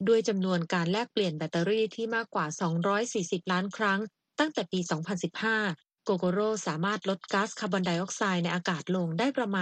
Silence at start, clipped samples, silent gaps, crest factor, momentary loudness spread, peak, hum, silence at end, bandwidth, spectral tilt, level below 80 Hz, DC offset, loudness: 0 s; under 0.1%; none; 20 dB; 4 LU; -10 dBFS; none; 0 s; 9.2 kHz; -5 dB/octave; -76 dBFS; under 0.1%; -30 LUFS